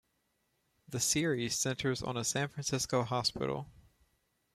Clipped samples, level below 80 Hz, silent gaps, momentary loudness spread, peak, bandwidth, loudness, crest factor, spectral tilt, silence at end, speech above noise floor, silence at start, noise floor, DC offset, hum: under 0.1%; -62 dBFS; none; 7 LU; -18 dBFS; 16 kHz; -33 LUFS; 18 dB; -3.5 dB/octave; 0.85 s; 45 dB; 0.9 s; -78 dBFS; under 0.1%; none